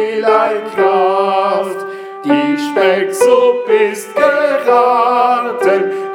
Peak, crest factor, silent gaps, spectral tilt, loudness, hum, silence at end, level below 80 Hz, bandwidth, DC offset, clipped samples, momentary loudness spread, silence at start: 0 dBFS; 12 dB; none; -4 dB/octave; -13 LUFS; none; 0 s; -64 dBFS; 17 kHz; under 0.1%; under 0.1%; 5 LU; 0 s